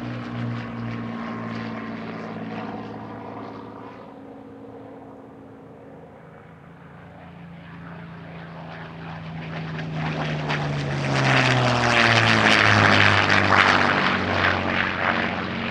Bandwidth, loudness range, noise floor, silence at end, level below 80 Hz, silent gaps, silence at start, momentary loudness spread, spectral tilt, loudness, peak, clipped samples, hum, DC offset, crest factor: 11 kHz; 25 LU; -44 dBFS; 0 s; -52 dBFS; none; 0 s; 25 LU; -5 dB/octave; -20 LUFS; -2 dBFS; under 0.1%; none; under 0.1%; 22 dB